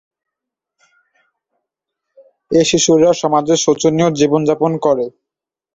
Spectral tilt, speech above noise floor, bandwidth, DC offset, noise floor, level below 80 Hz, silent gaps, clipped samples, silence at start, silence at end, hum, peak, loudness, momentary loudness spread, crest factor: -4.5 dB/octave; 72 dB; 8 kHz; under 0.1%; -85 dBFS; -54 dBFS; none; under 0.1%; 2.5 s; 0.65 s; none; -2 dBFS; -14 LUFS; 5 LU; 16 dB